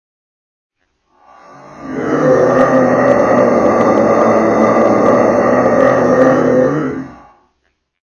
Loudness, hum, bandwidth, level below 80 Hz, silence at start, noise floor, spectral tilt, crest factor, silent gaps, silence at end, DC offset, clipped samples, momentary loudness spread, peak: -11 LUFS; none; 10 kHz; -46 dBFS; 1.7 s; -65 dBFS; -7.5 dB/octave; 12 dB; none; 0.9 s; under 0.1%; under 0.1%; 10 LU; 0 dBFS